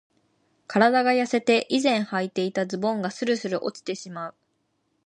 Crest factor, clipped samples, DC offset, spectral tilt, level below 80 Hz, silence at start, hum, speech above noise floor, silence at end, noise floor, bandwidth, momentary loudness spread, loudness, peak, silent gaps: 20 dB; under 0.1%; under 0.1%; -4.5 dB/octave; -76 dBFS; 0.7 s; none; 49 dB; 0.75 s; -72 dBFS; 10.5 kHz; 13 LU; -24 LUFS; -4 dBFS; none